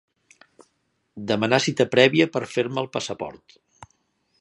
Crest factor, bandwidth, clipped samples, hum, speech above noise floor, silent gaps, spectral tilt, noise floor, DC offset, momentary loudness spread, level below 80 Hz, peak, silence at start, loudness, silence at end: 24 dB; 11.5 kHz; under 0.1%; none; 49 dB; none; -4.5 dB/octave; -71 dBFS; under 0.1%; 16 LU; -64 dBFS; 0 dBFS; 1.15 s; -22 LUFS; 0.55 s